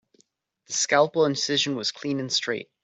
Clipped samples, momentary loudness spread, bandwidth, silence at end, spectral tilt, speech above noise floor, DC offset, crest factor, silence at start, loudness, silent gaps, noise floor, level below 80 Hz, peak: under 0.1%; 9 LU; 8.4 kHz; 0.2 s; -2.5 dB/octave; 42 dB; under 0.1%; 20 dB; 0.7 s; -24 LUFS; none; -67 dBFS; -72 dBFS; -6 dBFS